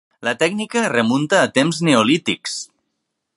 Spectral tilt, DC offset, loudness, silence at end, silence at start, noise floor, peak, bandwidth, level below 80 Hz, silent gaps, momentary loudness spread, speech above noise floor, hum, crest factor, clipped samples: -4 dB/octave; under 0.1%; -17 LUFS; 0.7 s; 0.2 s; -75 dBFS; 0 dBFS; 11.5 kHz; -64 dBFS; none; 10 LU; 58 dB; none; 18 dB; under 0.1%